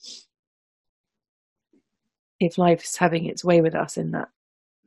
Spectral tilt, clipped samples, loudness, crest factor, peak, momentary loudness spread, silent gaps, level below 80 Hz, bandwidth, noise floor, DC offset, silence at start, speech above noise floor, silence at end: -5.5 dB/octave; under 0.1%; -22 LUFS; 22 dB; -4 dBFS; 17 LU; 0.39-1.04 s, 1.29-1.56 s, 2.19-2.39 s; -66 dBFS; 12.5 kHz; -68 dBFS; under 0.1%; 0.05 s; 46 dB; 0.6 s